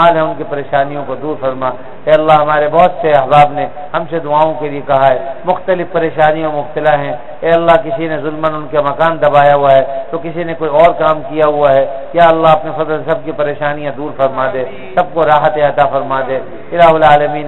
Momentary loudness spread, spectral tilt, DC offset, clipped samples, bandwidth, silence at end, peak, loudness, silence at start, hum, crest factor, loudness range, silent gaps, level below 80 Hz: 11 LU; -7.5 dB/octave; 5%; 0.3%; 4.2 kHz; 0 s; 0 dBFS; -12 LUFS; 0 s; none; 12 dB; 3 LU; none; -42 dBFS